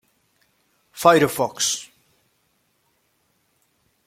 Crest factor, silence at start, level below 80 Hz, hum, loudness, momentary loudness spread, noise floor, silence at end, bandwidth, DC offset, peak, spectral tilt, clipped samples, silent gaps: 24 dB; 0.95 s; -64 dBFS; none; -19 LUFS; 12 LU; -67 dBFS; 2.25 s; 16.5 kHz; under 0.1%; -2 dBFS; -3 dB/octave; under 0.1%; none